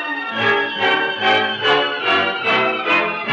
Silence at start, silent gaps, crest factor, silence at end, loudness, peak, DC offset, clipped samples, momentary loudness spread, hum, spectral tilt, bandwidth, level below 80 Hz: 0 s; none; 14 dB; 0 s; -16 LUFS; -4 dBFS; under 0.1%; under 0.1%; 1 LU; none; -4 dB/octave; 8.2 kHz; -68 dBFS